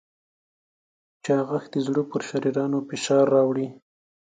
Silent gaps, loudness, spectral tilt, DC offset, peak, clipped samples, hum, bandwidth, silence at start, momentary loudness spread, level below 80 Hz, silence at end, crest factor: none; -24 LUFS; -6 dB/octave; under 0.1%; -8 dBFS; under 0.1%; none; 9.4 kHz; 1.25 s; 9 LU; -74 dBFS; 0.55 s; 18 dB